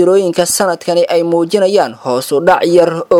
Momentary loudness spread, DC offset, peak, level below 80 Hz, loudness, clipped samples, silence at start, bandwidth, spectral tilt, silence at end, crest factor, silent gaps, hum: 5 LU; under 0.1%; 0 dBFS; -54 dBFS; -12 LUFS; 0.1%; 0 s; 17.5 kHz; -4 dB/octave; 0 s; 12 dB; none; none